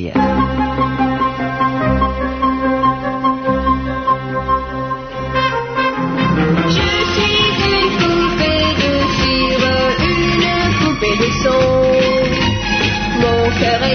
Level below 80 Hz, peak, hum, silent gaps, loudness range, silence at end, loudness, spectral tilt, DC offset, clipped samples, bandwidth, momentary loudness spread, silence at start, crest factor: -30 dBFS; 0 dBFS; none; none; 4 LU; 0 s; -15 LUFS; -5.5 dB/octave; under 0.1%; under 0.1%; 6.6 kHz; 5 LU; 0 s; 14 dB